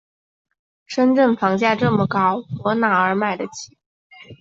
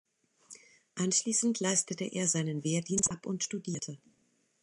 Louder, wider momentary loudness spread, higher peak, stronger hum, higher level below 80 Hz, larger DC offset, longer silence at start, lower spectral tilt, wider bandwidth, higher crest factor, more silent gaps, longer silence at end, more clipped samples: first, -19 LUFS vs -31 LUFS; about the same, 12 LU vs 11 LU; first, -2 dBFS vs -14 dBFS; neither; first, -58 dBFS vs -72 dBFS; neither; first, 0.9 s vs 0.5 s; first, -6 dB/octave vs -3.5 dB/octave; second, 7.8 kHz vs 11.5 kHz; about the same, 18 dB vs 20 dB; first, 3.86-4.10 s vs none; second, 0.05 s vs 0.65 s; neither